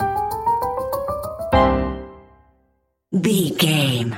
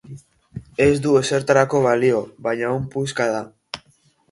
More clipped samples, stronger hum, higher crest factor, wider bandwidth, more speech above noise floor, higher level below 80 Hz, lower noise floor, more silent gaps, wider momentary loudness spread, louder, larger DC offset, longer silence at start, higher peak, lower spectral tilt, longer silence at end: neither; neither; about the same, 18 dB vs 18 dB; first, 16.5 kHz vs 11.5 kHz; first, 48 dB vs 41 dB; first, -36 dBFS vs -50 dBFS; first, -66 dBFS vs -59 dBFS; neither; second, 10 LU vs 18 LU; about the same, -20 LUFS vs -19 LUFS; neither; about the same, 0 s vs 0.05 s; about the same, -4 dBFS vs -2 dBFS; about the same, -5 dB/octave vs -5.5 dB/octave; second, 0 s vs 0.55 s